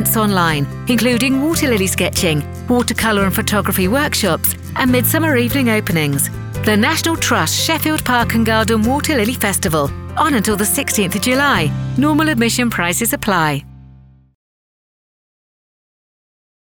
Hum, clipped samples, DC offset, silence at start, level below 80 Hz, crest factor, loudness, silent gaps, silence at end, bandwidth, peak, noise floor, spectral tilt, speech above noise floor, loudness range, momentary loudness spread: none; under 0.1%; under 0.1%; 0 s; -38 dBFS; 14 dB; -15 LUFS; none; 2.95 s; over 20 kHz; -2 dBFS; -43 dBFS; -4 dB/octave; 28 dB; 3 LU; 4 LU